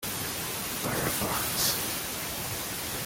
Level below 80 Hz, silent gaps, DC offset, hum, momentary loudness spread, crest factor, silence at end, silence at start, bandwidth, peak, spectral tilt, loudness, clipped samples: -52 dBFS; none; under 0.1%; none; 6 LU; 18 dB; 0 s; 0 s; 17 kHz; -14 dBFS; -2 dB/octave; -29 LUFS; under 0.1%